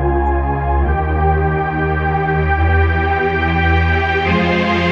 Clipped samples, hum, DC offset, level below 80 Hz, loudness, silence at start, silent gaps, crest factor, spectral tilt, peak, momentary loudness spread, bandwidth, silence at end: under 0.1%; none; under 0.1%; -22 dBFS; -15 LUFS; 0 s; none; 12 dB; -8 dB/octave; -2 dBFS; 3 LU; 6.2 kHz; 0 s